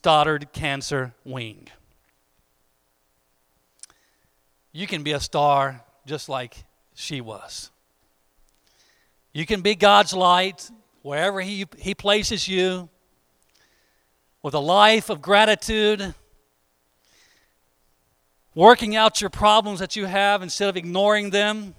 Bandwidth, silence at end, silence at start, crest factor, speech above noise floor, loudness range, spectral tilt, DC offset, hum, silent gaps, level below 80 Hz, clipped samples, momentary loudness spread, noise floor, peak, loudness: 16 kHz; 0.05 s; 0.05 s; 22 dB; 47 dB; 15 LU; -3.5 dB/octave; under 0.1%; none; none; -50 dBFS; under 0.1%; 20 LU; -68 dBFS; 0 dBFS; -20 LUFS